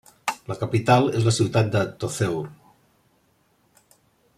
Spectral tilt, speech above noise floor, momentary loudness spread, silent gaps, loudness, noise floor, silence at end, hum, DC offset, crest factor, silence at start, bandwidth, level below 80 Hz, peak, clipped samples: -5.5 dB/octave; 43 dB; 12 LU; none; -23 LUFS; -64 dBFS; 1.85 s; none; under 0.1%; 20 dB; 0.25 s; 14.5 kHz; -58 dBFS; -4 dBFS; under 0.1%